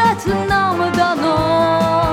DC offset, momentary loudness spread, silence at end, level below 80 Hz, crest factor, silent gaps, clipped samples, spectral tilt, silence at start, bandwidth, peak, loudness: under 0.1%; 2 LU; 0 s; -36 dBFS; 12 dB; none; under 0.1%; -5.5 dB/octave; 0 s; 17 kHz; -2 dBFS; -16 LUFS